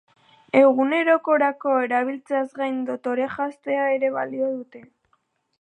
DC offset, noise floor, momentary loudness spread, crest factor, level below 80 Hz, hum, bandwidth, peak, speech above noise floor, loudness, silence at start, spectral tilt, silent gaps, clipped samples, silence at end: under 0.1%; -69 dBFS; 10 LU; 18 dB; -76 dBFS; none; 9 kHz; -4 dBFS; 47 dB; -22 LUFS; 0.55 s; -6 dB/octave; none; under 0.1%; 0.8 s